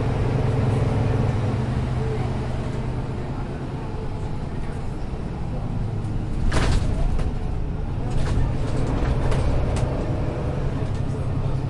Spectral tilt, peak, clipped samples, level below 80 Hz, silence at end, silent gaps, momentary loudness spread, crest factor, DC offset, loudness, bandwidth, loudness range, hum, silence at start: -7.5 dB/octave; -8 dBFS; under 0.1%; -28 dBFS; 0 s; none; 8 LU; 14 dB; under 0.1%; -26 LUFS; 11.5 kHz; 5 LU; none; 0 s